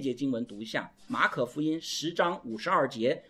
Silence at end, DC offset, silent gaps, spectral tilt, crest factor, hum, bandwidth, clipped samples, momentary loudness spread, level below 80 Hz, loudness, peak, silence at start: 0.1 s; under 0.1%; none; -4.5 dB/octave; 20 dB; none; 15 kHz; under 0.1%; 8 LU; -72 dBFS; -30 LUFS; -10 dBFS; 0 s